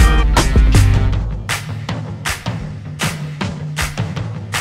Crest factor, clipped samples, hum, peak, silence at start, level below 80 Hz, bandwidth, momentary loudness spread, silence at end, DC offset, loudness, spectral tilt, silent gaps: 16 dB; under 0.1%; none; 0 dBFS; 0 s; -18 dBFS; 15.5 kHz; 12 LU; 0 s; under 0.1%; -18 LUFS; -5 dB/octave; none